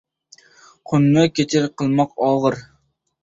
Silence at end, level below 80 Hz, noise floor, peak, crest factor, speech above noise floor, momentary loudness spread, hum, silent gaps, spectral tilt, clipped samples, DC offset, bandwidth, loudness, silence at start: 0.6 s; -56 dBFS; -64 dBFS; -2 dBFS; 18 dB; 47 dB; 7 LU; none; none; -6.5 dB/octave; under 0.1%; under 0.1%; 7.8 kHz; -18 LUFS; 0.9 s